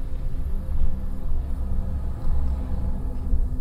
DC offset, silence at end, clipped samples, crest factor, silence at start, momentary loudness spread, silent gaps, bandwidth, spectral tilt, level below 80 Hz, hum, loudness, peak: under 0.1%; 0 s; under 0.1%; 12 dB; 0 s; 4 LU; none; 1.9 kHz; -9 dB/octave; -24 dBFS; none; -30 LUFS; -10 dBFS